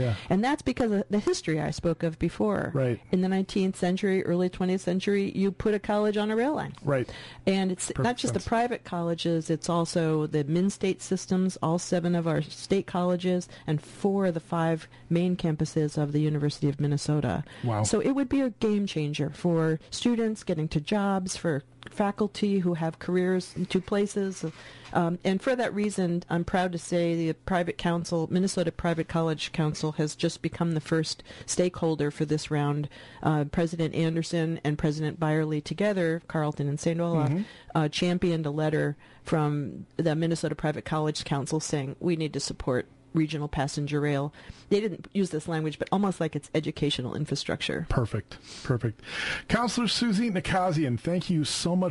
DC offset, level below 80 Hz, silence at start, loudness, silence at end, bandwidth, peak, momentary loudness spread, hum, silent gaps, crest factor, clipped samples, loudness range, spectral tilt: under 0.1%; -52 dBFS; 0 s; -28 LUFS; 0 s; 11.5 kHz; -12 dBFS; 5 LU; none; none; 16 dB; under 0.1%; 2 LU; -6 dB/octave